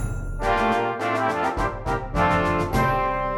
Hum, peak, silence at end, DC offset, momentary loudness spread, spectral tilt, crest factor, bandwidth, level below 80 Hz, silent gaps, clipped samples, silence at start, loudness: none; -8 dBFS; 0 s; under 0.1%; 6 LU; -6 dB/octave; 16 dB; 18.5 kHz; -34 dBFS; none; under 0.1%; 0 s; -23 LUFS